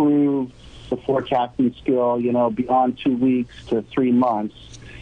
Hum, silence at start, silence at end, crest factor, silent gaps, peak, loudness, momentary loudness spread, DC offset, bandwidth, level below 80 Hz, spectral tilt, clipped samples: none; 0 s; 0 s; 12 dB; none; -8 dBFS; -21 LUFS; 10 LU; under 0.1%; 7.2 kHz; -50 dBFS; -8 dB/octave; under 0.1%